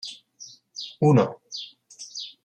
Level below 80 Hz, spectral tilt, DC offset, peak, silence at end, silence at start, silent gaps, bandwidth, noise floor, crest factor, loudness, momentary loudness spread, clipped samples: -70 dBFS; -6.5 dB/octave; under 0.1%; -6 dBFS; 0.15 s; 0.05 s; none; 9.2 kHz; -48 dBFS; 20 dB; -24 LUFS; 23 LU; under 0.1%